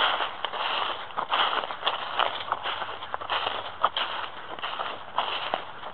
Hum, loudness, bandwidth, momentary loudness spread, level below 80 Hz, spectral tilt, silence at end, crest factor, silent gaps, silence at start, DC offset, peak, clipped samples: none; -29 LUFS; 6.4 kHz; 8 LU; -68 dBFS; -4.5 dB/octave; 0 s; 26 dB; none; 0 s; 0.7%; -4 dBFS; under 0.1%